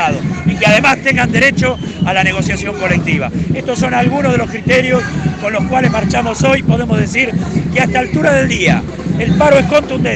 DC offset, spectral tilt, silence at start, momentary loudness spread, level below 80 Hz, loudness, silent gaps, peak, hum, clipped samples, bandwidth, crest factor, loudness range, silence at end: under 0.1%; -5.5 dB/octave; 0 s; 7 LU; -32 dBFS; -12 LUFS; none; 0 dBFS; none; under 0.1%; 9 kHz; 12 dB; 2 LU; 0 s